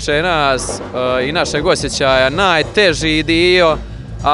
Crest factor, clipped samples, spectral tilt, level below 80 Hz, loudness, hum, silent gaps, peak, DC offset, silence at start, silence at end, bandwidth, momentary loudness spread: 14 dB; under 0.1%; -4 dB/octave; -32 dBFS; -14 LUFS; none; none; 0 dBFS; under 0.1%; 0 s; 0 s; 11.5 kHz; 8 LU